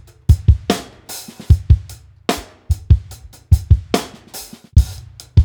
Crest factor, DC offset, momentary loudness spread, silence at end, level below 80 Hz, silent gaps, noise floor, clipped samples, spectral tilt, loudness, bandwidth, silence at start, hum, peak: 16 dB; under 0.1%; 18 LU; 0 s; -20 dBFS; none; -38 dBFS; under 0.1%; -6 dB/octave; -18 LUFS; 19.5 kHz; 0.3 s; none; 0 dBFS